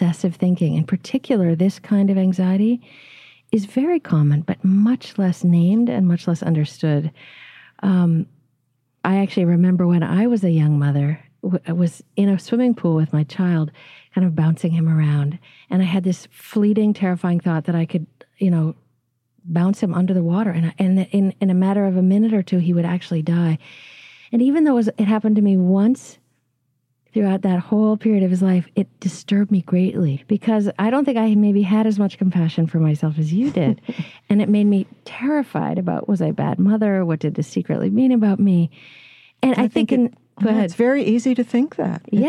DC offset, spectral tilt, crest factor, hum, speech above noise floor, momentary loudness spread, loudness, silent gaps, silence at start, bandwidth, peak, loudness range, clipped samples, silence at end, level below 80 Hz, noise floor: under 0.1%; -8.5 dB/octave; 14 dB; none; 52 dB; 7 LU; -19 LUFS; none; 0 s; 10 kHz; -4 dBFS; 2 LU; under 0.1%; 0 s; -66 dBFS; -70 dBFS